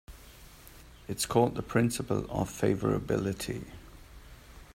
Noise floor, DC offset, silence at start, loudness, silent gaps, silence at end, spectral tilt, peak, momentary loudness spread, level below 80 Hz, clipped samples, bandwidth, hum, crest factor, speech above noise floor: -52 dBFS; under 0.1%; 0.1 s; -31 LUFS; none; 0.1 s; -5.5 dB/octave; -10 dBFS; 24 LU; -52 dBFS; under 0.1%; 16 kHz; none; 22 dB; 22 dB